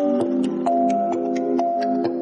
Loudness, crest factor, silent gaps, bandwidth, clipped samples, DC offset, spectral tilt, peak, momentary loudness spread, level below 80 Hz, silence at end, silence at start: -21 LUFS; 12 dB; none; 10 kHz; under 0.1%; under 0.1%; -7 dB/octave; -8 dBFS; 3 LU; -68 dBFS; 0 s; 0 s